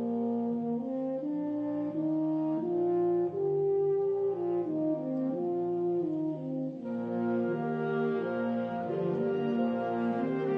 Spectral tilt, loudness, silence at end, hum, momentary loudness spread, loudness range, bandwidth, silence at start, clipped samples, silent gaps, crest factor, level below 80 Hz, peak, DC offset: -10 dB/octave; -31 LUFS; 0 s; none; 5 LU; 2 LU; 5 kHz; 0 s; under 0.1%; none; 12 dB; -76 dBFS; -18 dBFS; under 0.1%